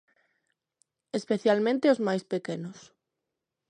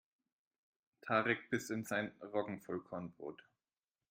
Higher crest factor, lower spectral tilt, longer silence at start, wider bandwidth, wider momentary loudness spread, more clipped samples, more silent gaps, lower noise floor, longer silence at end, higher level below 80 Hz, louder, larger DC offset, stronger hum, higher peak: about the same, 20 dB vs 24 dB; about the same, -6 dB/octave vs -5 dB/octave; about the same, 1.15 s vs 1.05 s; second, 10 kHz vs 16 kHz; about the same, 13 LU vs 15 LU; neither; neither; second, -85 dBFS vs under -90 dBFS; first, 0.9 s vs 0.75 s; about the same, -80 dBFS vs -82 dBFS; first, -27 LUFS vs -40 LUFS; neither; neither; first, -10 dBFS vs -18 dBFS